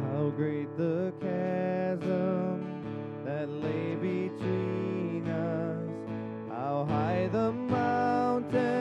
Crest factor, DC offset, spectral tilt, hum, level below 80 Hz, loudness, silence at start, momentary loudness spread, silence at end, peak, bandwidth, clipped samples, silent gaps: 14 dB; under 0.1%; -9 dB/octave; none; -66 dBFS; -31 LUFS; 0 s; 8 LU; 0 s; -16 dBFS; 8.8 kHz; under 0.1%; none